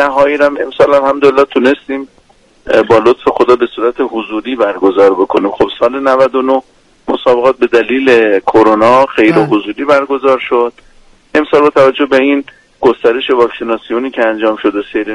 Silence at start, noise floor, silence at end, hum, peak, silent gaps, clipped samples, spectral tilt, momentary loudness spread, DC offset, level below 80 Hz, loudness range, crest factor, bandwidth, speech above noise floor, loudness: 0 s; -47 dBFS; 0 s; none; 0 dBFS; none; 0.3%; -6 dB/octave; 8 LU; under 0.1%; -46 dBFS; 3 LU; 10 dB; 11 kHz; 37 dB; -10 LUFS